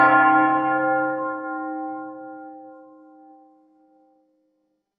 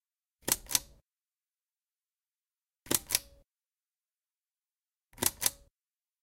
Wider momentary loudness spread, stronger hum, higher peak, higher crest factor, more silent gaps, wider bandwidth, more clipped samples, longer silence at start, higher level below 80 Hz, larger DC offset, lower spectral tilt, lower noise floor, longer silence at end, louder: first, 23 LU vs 3 LU; neither; first, -4 dBFS vs -8 dBFS; second, 20 dB vs 32 dB; neither; second, 4.9 kHz vs 17 kHz; neither; second, 0 s vs 0.45 s; about the same, -64 dBFS vs -62 dBFS; neither; first, -8.5 dB/octave vs -0.5 dB/octave; second, -72 dBFS vs under -90 dBFS; first, 2.15 s vs 0.7 s; first, -21 LUFS vs -31 LUFS